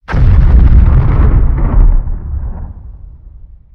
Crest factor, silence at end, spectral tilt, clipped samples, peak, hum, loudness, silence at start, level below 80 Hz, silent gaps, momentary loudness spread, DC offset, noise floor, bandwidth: 8 dB; 0.4 s; -10.5 dB/octave; 2%; 0 dBFS; none; -11 LUFS; 0.1 s; -10 dBFS; none; 18 LU; under 0.1%; -34 dBFS; 3.6 kHz